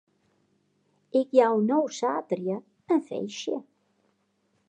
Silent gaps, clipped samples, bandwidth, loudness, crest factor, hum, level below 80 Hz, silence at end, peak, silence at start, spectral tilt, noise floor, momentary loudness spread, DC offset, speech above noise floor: none; under 0.1%; 9 kHz; -27 LUFS; 22 dB; none; -88 dBFS; 1.05 s; -6 dBFS; 1.15 s; -5.5 dB/octave; -72 dBFS; 12 LU; under 0.1%; 46 dB